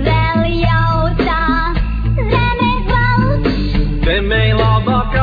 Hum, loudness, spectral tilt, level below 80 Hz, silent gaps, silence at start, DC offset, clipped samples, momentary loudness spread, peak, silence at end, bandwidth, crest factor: none; -15 LUFS; -8.5 dB/octave; -18 dBFS; none; 0 s; under 0.1%; under 0.1%; 4 LU; 0 dBFS; 0 s; 5 kHz; 12 dB